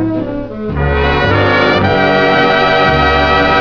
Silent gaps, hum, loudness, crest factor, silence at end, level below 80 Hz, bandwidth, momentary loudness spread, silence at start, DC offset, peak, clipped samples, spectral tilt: none; none; -11 LUFS; 12 dB; 0 s; -24 dBFS; 5.4 kHz; 9 LU; 0 s; 1%; 0 dBFS; under 0.1%; -6.5 dB/octave